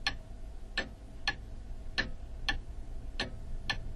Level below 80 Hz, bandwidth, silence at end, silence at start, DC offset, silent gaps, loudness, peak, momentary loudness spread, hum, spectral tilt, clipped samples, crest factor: -42 dBFS; 11.5 kHz; 0 s; 0 s; under 0.1%; none; -39 LUFS; -16 dBFS; 12 LU; none; -3 dB/octave; under 0.1%; 22 dB